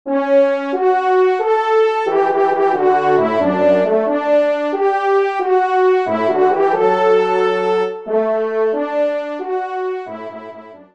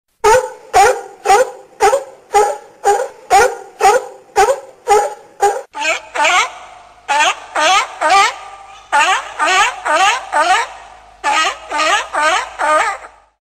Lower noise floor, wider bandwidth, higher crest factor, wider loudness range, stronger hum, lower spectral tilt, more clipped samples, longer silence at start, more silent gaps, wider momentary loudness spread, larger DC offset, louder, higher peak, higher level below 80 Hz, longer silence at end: about the same, -36 dBFS vs -38 dBFS; second, 7.4 kHz vs 15.5 kHz; about the same, 14 dB vs 14 dB; about the same, 3 LU vs 2 LU; neither; first, -6.5 dB/octave vs -0.5 dB/octave; neither; second, 0.05 s vs 0.25 s; neither; about the same, 8 LU vs 8 LU; first, 0.2% vs under 0.1%; about the same, -16 LUFS vs -14 LUFS; about the same, -2 dBFS vs -2 dBFS; second, -68 dBFS vs -46 dBFS; second, 0.1 s vs 0.4 s